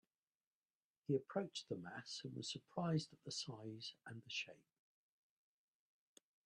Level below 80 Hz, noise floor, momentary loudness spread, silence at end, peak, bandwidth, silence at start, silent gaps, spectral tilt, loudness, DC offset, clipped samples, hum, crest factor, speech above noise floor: -86 dBFS; under -90 dBFS; 10 LU; 1.9 s; -28 dBFS; 11 kHz; 1.1 s; none; -5 dB/octave; -47 LUFS; under 0.1%; under 0.1%; none; 22 dB; over 44 dB